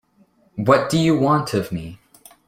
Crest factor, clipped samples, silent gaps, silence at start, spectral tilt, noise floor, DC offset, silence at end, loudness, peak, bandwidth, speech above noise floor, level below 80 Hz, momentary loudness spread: 20 dB; under 0.1%; none; 0.55 s; -6 dB/octave; -58 dBFS; under 0.1%; 0.55 s; -19 LUFS; -2 dBFS; 16 kHz; 40 dB; -52 dBFS; 16 LU